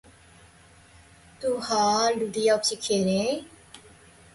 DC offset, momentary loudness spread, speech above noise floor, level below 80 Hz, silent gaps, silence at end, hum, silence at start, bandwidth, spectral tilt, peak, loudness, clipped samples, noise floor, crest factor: under 0.1%; 10 LU; 29 dB; -60 dBFS; none; 0.55 s; none; 1.4 s; 11.5 kHz; -3.5 dB/octave; -10 dBFS; -25 LUFS; under 0.1%; -54 dBFS; 16 dB